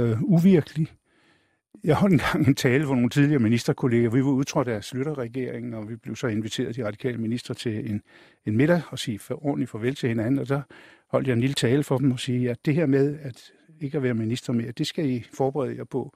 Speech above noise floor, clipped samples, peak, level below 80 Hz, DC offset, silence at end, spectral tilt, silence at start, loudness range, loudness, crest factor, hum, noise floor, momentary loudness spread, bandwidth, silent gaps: 40 dB; under 0.1%; -6 dBFS; -56 dBFS; under 0.1%; 0.05 s; -6.5 dB/octave; 0 s; 6 LU; -25 LUFS; 18 dB; none; -64 dBFS; 11 LU; 15.5 kHz; none